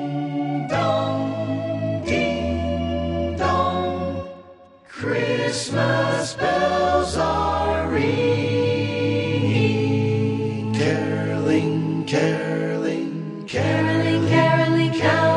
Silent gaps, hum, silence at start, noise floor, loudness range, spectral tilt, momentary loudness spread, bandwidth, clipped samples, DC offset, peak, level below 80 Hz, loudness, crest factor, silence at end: none; none; 0 s; -46 dBFS; 3 LU; -6 dB/octave; 6 LU; 11.5 kHz; under 0.1%; under 0.1%; -4 dBFS; -40 dBFS; -21 LUFS; 16 dB; 0 s